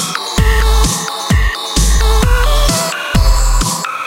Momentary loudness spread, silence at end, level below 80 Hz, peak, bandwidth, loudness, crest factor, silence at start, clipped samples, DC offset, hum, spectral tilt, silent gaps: 3 LU; 0 s; -14 dBFS; 0 dBFS; 16.5 kHz; -13 LUFS; 12 dB; 0 s; under 0.1%; under 0.1%; none; -3.5 dB/octave; none